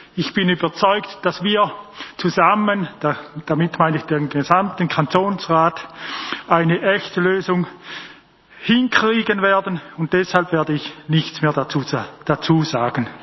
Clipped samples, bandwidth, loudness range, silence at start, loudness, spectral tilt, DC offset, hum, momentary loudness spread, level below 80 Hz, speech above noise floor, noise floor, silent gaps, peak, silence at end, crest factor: under 0.1%; 6.2 kHz; 2 LU; 0 s; -19 LUFS; -6.5 dB/octave; under 0.1%; none; 11 LU; -56 dBFS; 27 dB; -46 dBFS; none; 0 dBFS; 0 s; 20 dB